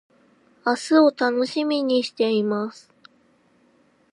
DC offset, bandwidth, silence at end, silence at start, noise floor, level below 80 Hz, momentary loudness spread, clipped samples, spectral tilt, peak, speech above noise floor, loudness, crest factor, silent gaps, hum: under 0.1%; 11.5 kHz; 1.4 s; 0.65 s; -60 dBFS; -78 dBFS; 10 LU; under 0.1%; -4.5 dB/octave; -6 dBFS; 40 dB; -22 LUFS; 18 dB; none; none